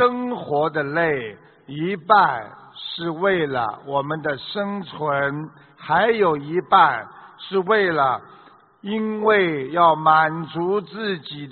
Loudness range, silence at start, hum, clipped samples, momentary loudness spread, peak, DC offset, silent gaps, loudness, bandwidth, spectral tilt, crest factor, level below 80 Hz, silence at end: 4 LU; 0 s; none; under 0.1%; 15 LU; -2 dBFS; under 0.1%; none; -20 LUFS; 4.6 kHz; -3 dB/octave; 20 dB; -62 dBFS; 0 s